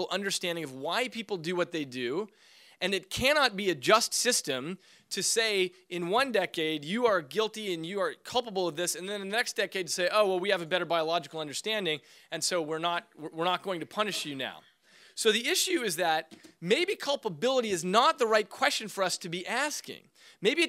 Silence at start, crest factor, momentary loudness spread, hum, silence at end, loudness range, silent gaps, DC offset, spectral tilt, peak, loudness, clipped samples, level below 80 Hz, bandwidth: 0 s; 22 dB; 10 LU; none; 0 s; 4 LU; none; under 0.1%; -2.5 dB/octave; -8 dBFS; -29 LUFS; under 0.1%; -66 dBFS; 16 kHz